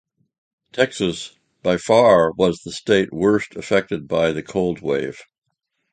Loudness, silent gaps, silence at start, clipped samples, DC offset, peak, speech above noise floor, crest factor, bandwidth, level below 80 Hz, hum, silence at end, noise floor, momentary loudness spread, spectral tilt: -19 LUFS; none; 0.75 s; under 0.1%; under 0.1%; 0 dBFS; 56 dB; 20 dB; 9.4 kHz; -52 dBFS; none; 0.7 s; -75 dBFS; 12 LU; -5.5 dB/octave